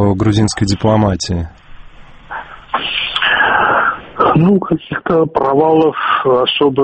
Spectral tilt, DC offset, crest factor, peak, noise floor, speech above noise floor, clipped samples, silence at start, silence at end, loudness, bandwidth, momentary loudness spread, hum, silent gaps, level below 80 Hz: -5.5 dB/octave; under 0.1%; 14 dB; 0 dBFS; -36 dBFS; 23 dB; under 0.1%; 0 s; 0 s; -13 LUFS; 8.8 kHz; 11 LU; none; none; -38 dBFS